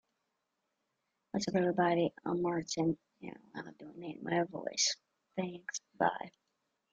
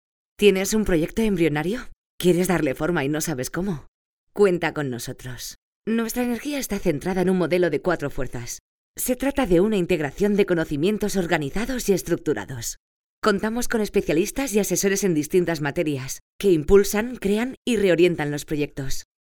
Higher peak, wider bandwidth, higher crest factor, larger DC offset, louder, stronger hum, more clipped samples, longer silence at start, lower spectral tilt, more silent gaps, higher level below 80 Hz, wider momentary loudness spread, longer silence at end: second, -14 dBFS vs -2 dBFS; second, 9.4 kHz vs over 20 kHz; about the same, 22 dB vs 20 dB; neither; second, -35 LUFS vs -23 LUFS; neither; neither; first, 1.35 s vs 0.4 s; about the same, -4 dB/octave vs -5 dB/octave; second, none vs 1.96-2.18 s, 3.88-4.27 s, 5.58-5.82 s, 8.60-8.94 s, 12.80-13.22 s, 16.21-16.39 s, 17.57-17.63 s; second, -74 dBFS vs -40 dBFS; first, 17 LU vs 13 LU; first, 0.65 s vs 0.2 s